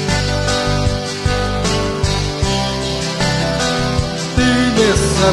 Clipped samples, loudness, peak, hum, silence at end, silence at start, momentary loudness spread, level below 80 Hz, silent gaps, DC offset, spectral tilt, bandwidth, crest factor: under 0.1%; -16 LUFS; 0 dBFS; none; 0 s; 0 s; 6 LU; -26 dBFS; none; under 0.1%; -4.5 dB/octave; 13 kHz; 14 dB